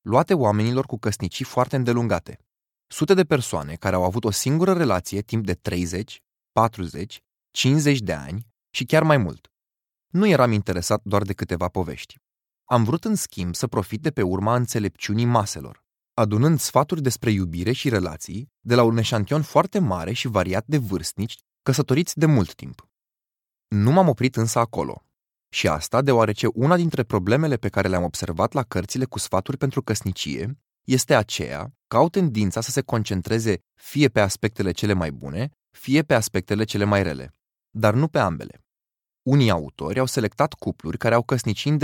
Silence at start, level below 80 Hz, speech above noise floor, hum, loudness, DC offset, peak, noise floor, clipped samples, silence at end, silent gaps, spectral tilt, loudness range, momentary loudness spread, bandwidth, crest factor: 0.05 s; -50 dBFS; over 68 dB; none; -22 LUFS; under 0.1%; -2 dBFS; under -90 dBFS; under 0.1%; 0 s; none; -5.5 dB/octave; 3 LU; 12 LU; 17.5 kHz; 20 dB